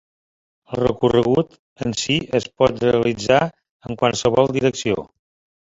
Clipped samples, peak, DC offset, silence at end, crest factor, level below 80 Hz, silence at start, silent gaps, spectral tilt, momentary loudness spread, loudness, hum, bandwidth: under 0.1%; -2 dBFS; under 0.1%; 0.65 s; 18 dB; -48 dBFS; 0.7 s; 1.59-1.76 s, 3.70-3.80 s; -5 dB/octave; 10 LU; -19 LUFS; none; 8 kHz